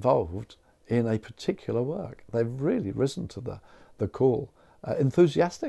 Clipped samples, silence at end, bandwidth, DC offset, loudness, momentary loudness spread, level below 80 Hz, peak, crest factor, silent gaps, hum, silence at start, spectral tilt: under 0.1%; 0 s; 12 kHz; under 0.1%; -28 LUFS; 17 LU; -58 dBFS; -8 dBFS; 18 dB; none; none; 0 s; -7.5 dB/octave